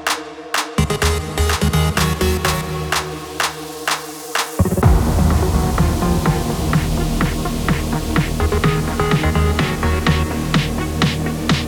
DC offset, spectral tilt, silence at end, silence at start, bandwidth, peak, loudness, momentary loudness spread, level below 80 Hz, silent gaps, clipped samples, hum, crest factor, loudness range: under 0.1%; -5 dB/octave; 0 s; 0 s; 20 kHz; 0 dBFS; -18 LUFS; 5 LU; -24 dBFS; none; under 0.1%; none; 18 dB; 2 LU